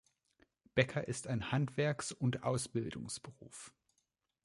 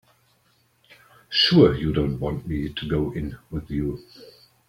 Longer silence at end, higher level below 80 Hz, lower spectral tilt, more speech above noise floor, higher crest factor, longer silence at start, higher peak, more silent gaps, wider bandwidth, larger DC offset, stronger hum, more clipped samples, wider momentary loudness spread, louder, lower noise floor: first, 0.75 s vs 0.4 s; second, -66 dBFS vs -42 dBFS; second, -5 dB/octave vs -7 dB/octave; first, 46 dB vs 41 dB; about the same, 24 dB vs 22 dB; second, 0.75 s vs 1.3 s; second, -16 dBFS vs -2 dBFS; neither; second, 11.5 kHz vs 15.5 kHz; neither; neither; neither; about the same, 17 LU vs 16 LU; second, -37 LUFS vs -23 LUFS; first, -83 dBFS vs -64 dBFS